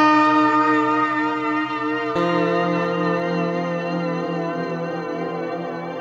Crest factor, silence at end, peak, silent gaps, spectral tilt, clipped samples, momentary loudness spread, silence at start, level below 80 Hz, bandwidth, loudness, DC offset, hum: 14 dB; 0 s; -6 dBFS; none; -7 dB/octave; under 0.1%; 10 LU; 0 s; -66 dBFS; 7.6 kHz; -21 LUFS; under 0.1%; none